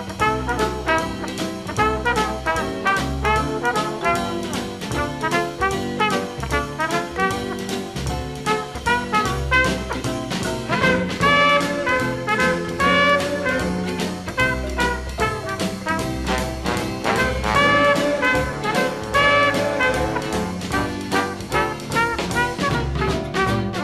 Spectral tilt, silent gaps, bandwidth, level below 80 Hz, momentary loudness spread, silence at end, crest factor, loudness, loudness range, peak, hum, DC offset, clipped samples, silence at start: -4.5 dB/octave; none; 13.5 kHz; -36 dBFS; 9 LU; 0 s; 16 dB; -21 LUFS; 5 LU; -4 dBFS; none; 0.1%; under 0.1%; 0 s